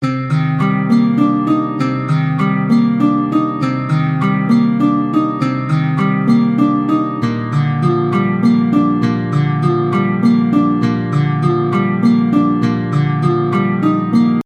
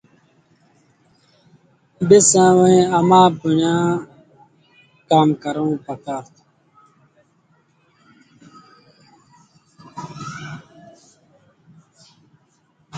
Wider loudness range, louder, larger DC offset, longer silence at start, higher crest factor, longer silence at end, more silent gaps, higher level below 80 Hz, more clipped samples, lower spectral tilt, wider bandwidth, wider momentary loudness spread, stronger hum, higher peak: second, 1 LU vs 23 LU; about the same, -14 LUFS vs -15 LUFS; neither; second, 0 s vs 2 s; second, 14 dB vs 20 dB; about the same, 0.05 s vs 0 s; neither; first, -52 dBFS vs -60 dBFS; neither; first, -9 dB/octave vs -5 dB/octave; about the same, 8.8 kHz vs 9.6 kHz; second, 3 LU vs 22 LU; neither; about the same, 0 dBFS vs 0 dBFS